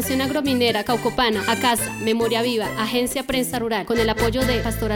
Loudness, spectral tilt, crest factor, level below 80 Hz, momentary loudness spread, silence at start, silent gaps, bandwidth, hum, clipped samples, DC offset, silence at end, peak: -21 LUFS; -4 dB/octave; 16 dB; -38 dBFS; 3 LU; 0 s; none; 19.5 kHz; none; under 0.1%; under 0.1%; 0 s; -4 dBFS